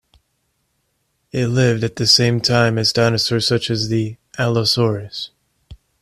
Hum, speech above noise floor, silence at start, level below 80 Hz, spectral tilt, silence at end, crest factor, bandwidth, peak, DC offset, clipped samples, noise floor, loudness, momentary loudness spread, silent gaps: none; 51 dB; 1.35 s; -50 dBFS; -4.5 dB/octave; 0.25 s; 18 dB; 13 kHz; 0 dBFS; under 0.1%; under 0.1%; -68 dBFS; -17 LUFS; 14 LU; none